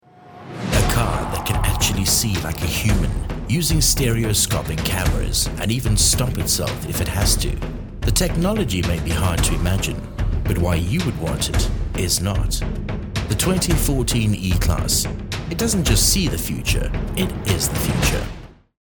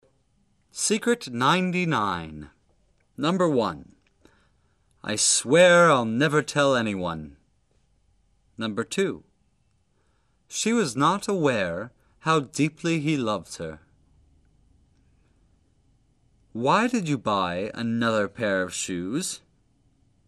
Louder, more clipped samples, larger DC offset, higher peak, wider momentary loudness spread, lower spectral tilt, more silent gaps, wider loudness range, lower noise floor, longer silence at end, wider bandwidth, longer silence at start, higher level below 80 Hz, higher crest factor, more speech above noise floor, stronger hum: first, -20 LUFS vs -24 LUFS; neither; neither; first, -2 dBFS vs -6 dBFS; second, 9 LU vs 17 LU; about the same, -4 dB/octave vs -4 dB/octave; neither; second, 3 LU vs 11 LU; second, -41 dBFS vs -68 dBFS; second, 0.3 s vs 0.9 s; first, over 20 kHz vs 13 kHz; second, 0.2 s vs 0.75 s; first, -26 dBFS vs -60 dBFS; about the same, 18 dB vs 20 dB; second, 22 dB vs 44 dB; neither